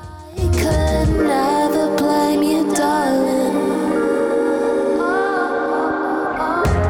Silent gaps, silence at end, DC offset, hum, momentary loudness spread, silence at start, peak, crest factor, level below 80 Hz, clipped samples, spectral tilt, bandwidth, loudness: none; 0 s; under 0.1%; none; 3 LU; 0 s; -8 dBFS; 8 dB; -30 dBFS; under 0.1%; -6 dB/octave; 18.5 kHz; -18 LUFS